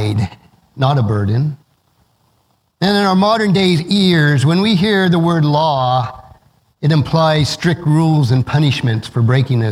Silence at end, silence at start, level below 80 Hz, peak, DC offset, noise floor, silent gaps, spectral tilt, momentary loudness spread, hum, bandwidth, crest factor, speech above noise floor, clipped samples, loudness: 0 s; 0 s; -46 dBFS; 0 dBFS; under 0.1%; -60 dBFS; none; -6.5 dB/octave; 6 LU; none; 12.5 kHz; 14 dB; 47 dB; under 0.1%; -14 LUFS